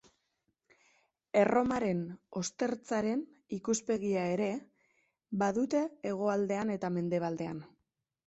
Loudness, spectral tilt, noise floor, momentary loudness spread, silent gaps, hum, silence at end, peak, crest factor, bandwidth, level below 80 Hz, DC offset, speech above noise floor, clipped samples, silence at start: -33 LUFS; -5.5 dB/octave; -83 dBFS; 10 LU; none; none; 0.6 s; -14 dBFS; 20 dB; 8.2 kHz; -68 dBFS; under 0.1%; 51 dB; under 0.1%; 1.35 s